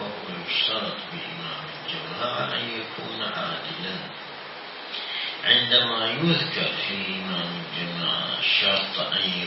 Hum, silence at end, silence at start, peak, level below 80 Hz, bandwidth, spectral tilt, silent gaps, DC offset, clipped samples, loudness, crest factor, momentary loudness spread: none; 0 s; 0 s; -4 dBFS; -70 dBFS; 5.8 kHz; -7.5 dB/octave; none; under 0.1%; under 0.1%; -24 LUFS; 24 dB; 14 LU